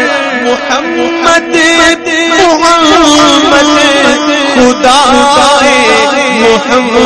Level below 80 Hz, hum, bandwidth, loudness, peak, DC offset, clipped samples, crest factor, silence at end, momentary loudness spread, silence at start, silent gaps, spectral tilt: -36 dBFS; none; 12 kHz; -6 LUFS; 0 dBFS; under 0.1%; 4%; 6 dB; 0 s; 6 LU; 0 s; none; -2 dB/octave